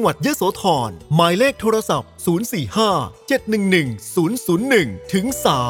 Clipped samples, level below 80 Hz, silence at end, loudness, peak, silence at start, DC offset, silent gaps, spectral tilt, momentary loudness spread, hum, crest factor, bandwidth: under 0.1%; -50 dBFS; 0 s; -19 LUFS; 0 dBFS; 0 s; under 0.1%; none; -5 dB/octave; 6 LU; none; 18 dB; 19 kHz